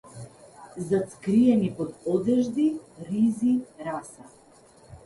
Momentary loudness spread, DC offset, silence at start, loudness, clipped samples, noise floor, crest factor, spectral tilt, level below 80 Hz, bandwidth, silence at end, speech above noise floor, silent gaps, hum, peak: 22 LU; under 0.1%; 0.05 s; -25 LUFS; under 0.1%; -54 dBFS; 16 dB; -7.5 dB/octave; -62 dBFS; 11.5 kHz; 0.1 s; 30 dB; none; none; -10 dBFS